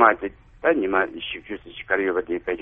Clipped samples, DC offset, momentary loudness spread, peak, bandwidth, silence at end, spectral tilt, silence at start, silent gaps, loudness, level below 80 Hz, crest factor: under 0.1%; under 0.1%; 14 LU; 0 dBFS; 3.8 kHz; 0 s; -7.5 dB/octave; 0 s; none; -24 LUFS; -52 dBFS; 22 dB